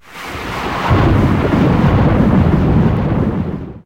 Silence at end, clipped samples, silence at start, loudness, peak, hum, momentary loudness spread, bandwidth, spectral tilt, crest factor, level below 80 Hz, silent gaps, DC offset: 0.05 s; under 0.1%; 0.1 s; -14 LUFS; 0 dBFS; none; 11 LU; 16 kHz; -8.5 dB/octave; 12 dB; -24 dBFS; none; under 0.1%